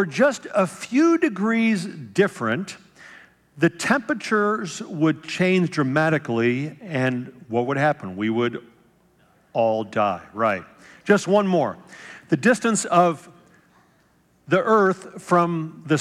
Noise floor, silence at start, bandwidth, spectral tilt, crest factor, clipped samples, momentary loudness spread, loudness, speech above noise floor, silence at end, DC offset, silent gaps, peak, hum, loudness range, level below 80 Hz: -61 dBFS; 0 s; 13 kHz; -5.5 dB/octave; 20 dB; under 0.1%; 10 LU; -22 LUFS; 39 dB; 0 s; under 0.1%; none; -4 dBFS; none; 3 LU; -70 dBFS